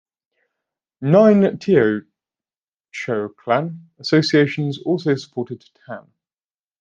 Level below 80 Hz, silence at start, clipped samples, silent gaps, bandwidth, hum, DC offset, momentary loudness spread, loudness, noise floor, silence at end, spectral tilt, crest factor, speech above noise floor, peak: -64 dBFS; 1 s; under 0.1%; 2.57-2.61 s, 2.68-2.72 s; 7.6 kHz; none; under 0.1%; 22 LU; -18 LUFS; under -90 dBFS; 0.8 s; -7 dB/octave; 18 dB; over 72 dB; -2 dBFS